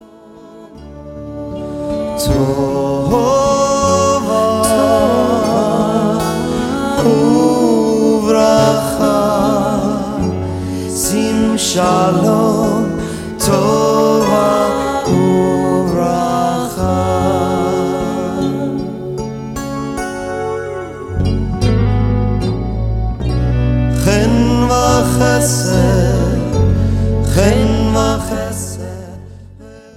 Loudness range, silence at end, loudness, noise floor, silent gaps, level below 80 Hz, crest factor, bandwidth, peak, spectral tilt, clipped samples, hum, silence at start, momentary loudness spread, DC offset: 5 LU; 0.05 s; -14 LUFS; -38 dBFS; none; -26 dBFS; 14 dB; 16.5 kHz; 0 dBFS; -6 dB/octave; under 0.1%; none; 0.25 s; 10 LU; under 0.1%